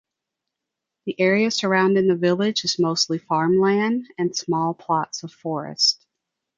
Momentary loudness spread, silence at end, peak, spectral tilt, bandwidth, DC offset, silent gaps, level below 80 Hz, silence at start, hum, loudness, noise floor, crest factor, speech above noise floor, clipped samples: 11 LU; 0.65 s; -4 dBFS; -4 dB/octave; 7.6 kHz; under 0.1%; none; -68 dBFS; 1.05 s; none; -21 LUFS; -84 dBFS; 18 dB; 63 dB; under 0.1%